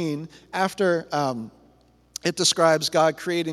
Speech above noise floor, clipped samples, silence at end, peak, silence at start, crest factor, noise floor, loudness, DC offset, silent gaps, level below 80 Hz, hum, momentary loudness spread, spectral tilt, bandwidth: 35 dB; under 0.1%; 0 s; -4 dBFS; 0 s; 20 dB; -58 dBFS; -23 LUFS; under 0.1%; none; -64 dBFS; none; 15 LU; -3.5 dB/octave; 15 kHz